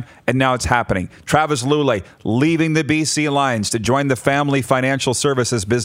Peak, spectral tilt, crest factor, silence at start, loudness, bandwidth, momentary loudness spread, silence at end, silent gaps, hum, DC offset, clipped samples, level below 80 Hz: 0 dBFS; -4.5 dB/octave; 18 dB; 0 s; -18 LUFS; 16 kHz; 3 LU; 0 s; none; none; under 0.1%; under 0.1%; -44 dBFS